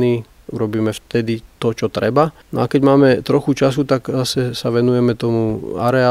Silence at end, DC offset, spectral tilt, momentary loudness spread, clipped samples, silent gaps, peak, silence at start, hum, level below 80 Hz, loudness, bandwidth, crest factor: 0 s; under 0.1%; -6.5 dB/octave; 9 LU; under 0.1%; none; 0 dBFS; 0 s; none; -48 dBFS; -17 LUFS; 15.5 kHz; 16 dB